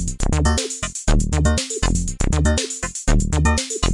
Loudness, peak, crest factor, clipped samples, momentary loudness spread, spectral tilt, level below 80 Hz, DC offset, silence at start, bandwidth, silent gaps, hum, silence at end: -20 LUFS; -4 dBFS; 14 dB; under 0.1%; 5 LU; -4.5 dB/octave; -22 dBFS; under 0.1%; 0 s; 11.5 kHz; none; none; 0 s